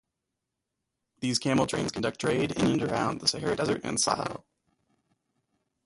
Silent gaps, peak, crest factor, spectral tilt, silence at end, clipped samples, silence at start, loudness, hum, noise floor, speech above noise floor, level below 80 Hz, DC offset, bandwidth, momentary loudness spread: none; -8 dBFS; 22 dB; -4 dB/octave; 1.45 s; under 0.1%; 1.2 s; -28 LUFS; none; -85 dBFS; 57 dB; -58 dBFS; under 0.1%; 11.5 kHz; 5 LU